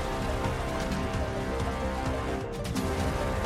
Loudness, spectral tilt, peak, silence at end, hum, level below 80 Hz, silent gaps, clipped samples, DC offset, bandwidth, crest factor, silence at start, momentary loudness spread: -31 LUFS; -5.5 dB/octave; -16 dBFS; 0 s; none; -36 dBFS; none; under 0.1%; under 0.1%; 16 kHz; 14 dB; 0 s; 2 LU